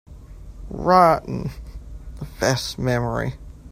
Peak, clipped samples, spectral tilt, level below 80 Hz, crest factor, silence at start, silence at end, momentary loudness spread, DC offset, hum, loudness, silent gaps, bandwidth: -2 dBFS; under 0.1%; -5.5 dB/octave; -38 dBFS; 20 dB; 0.1 s; 0 s; 25 LU; under 0.1%; none; -20 LUFS; none; 16 kHz